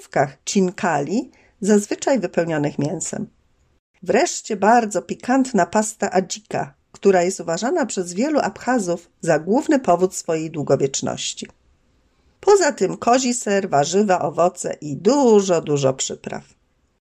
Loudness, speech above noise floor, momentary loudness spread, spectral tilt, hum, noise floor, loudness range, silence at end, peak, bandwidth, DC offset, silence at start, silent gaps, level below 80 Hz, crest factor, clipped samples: -20 LUFS; 41 dB; 10 LU; -4.5 dB/octave; none; -61 dBFS; 3 LU; 0.75 s; -4 dBFS; 13.5 kHz; under 0.1%; 0.15 s; 3.79-3.94 s; -60 dBFS; 16 dB; under 0.1%